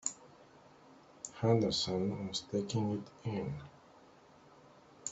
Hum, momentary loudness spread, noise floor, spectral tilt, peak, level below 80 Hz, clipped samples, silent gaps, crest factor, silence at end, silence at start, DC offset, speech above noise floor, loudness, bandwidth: none; 18 LU; -61 dBFS; -5 dB/octave; -16 dBFS; -68 dBFS; under 0.1%; none; 22 dB; 0 s; 0.05 s; under 0.1%; 26 dB; -36 LUFS; 8.2 kHz